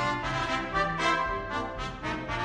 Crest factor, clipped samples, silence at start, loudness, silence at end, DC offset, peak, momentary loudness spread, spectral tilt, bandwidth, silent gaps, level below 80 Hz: 16 dB; under 0.1%; 0 s; -30 LUFS; 0 s; under 0.1%; -14 dBFS; 8 LU; -4.5 dB/octave; 10.5 kHz; none; -44 dBFS